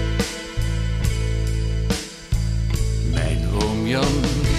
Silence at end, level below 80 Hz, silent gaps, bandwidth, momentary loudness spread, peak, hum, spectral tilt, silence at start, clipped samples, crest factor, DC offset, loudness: 0 s; -24 dBFS; none; 14.5 kHz; 5 LU; -8 dBFS; none; -5.5 dB/octave; 0 s; under 0.1%; 14 dB; under 0.1%; -23 LUFS